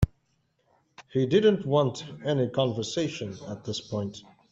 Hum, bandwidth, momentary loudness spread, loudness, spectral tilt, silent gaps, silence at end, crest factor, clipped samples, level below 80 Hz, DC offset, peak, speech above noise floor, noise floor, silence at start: none; 8 kHz; 15 LU; -28 LUFS; -6 dB/octave; none; 0.3 s; 20 dB; under 0.1%; -48 dBFS; under 0.1%; -8 dBFS; 45 dB; -72 dBFS; 0 s